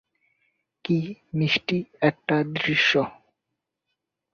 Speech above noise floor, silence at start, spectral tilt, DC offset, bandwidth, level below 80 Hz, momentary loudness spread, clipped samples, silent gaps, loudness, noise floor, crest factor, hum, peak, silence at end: 59 dB; 0.85 s; -6 dB/octave; under 0.1%; 6.8 kHz; -64 dBFS; 10 LU; under 0.1%; none; -24 LUFS; -83 dBFS; 22 dB; none; -6 dBFS; 1.2 s